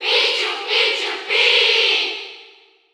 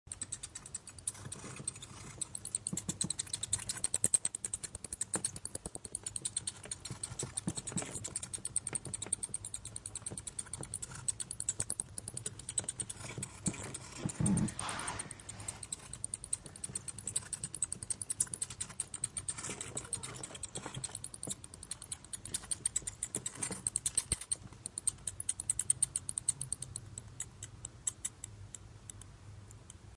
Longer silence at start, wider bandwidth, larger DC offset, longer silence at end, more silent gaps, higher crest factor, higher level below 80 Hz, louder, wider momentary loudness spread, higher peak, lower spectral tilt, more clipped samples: about the same, 0 s vs 0.05 s; first, over 20 kHz vs 11.5 kHz; neither; first, 0.5 s vs 0 s; neither; second, 16 dB vs 28 dB; second, -86 dBFS vs -60 dBFS; first, -15 LUFS vs -38 LUFS; about the same, 11 LU vs 11 LU; first, -2 dBFS vs -14 dBFS; second, 1.5 dB/octave vs -2.5 dB/octave; neither